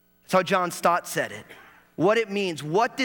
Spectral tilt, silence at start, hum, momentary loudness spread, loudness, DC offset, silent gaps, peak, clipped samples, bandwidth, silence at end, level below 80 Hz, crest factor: -4.5 dB/octave; 0.3 s; none; 9 LU; -24 LUFS; under 0.1%; none; -8 dBFS; under 0.1%; over 20 kHz; 0 s; -70 dBFS; 18 dB